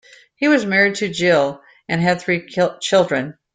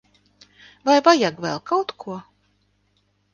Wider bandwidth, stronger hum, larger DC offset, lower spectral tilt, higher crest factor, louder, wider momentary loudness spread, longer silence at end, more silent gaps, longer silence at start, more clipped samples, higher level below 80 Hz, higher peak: about the same, 9.4 kHz vs 9.6 kHz; second, none vs 50 Hz at -55 dBFS; neither; about the same, -5 dB/octave vs -4 dB/octave; second, 16 dB vs 22 dB; about the same, -18 LUFS vs -20 LUFS; second, 8 LU vs 20 LU; second, 0.2 s vs 1.15 s; neither; second, 0.4 s vs 0.85 s; neither; first, -58 dBFS vs -68 dBFS; about the same, -2 dBFS vs -2 dBFS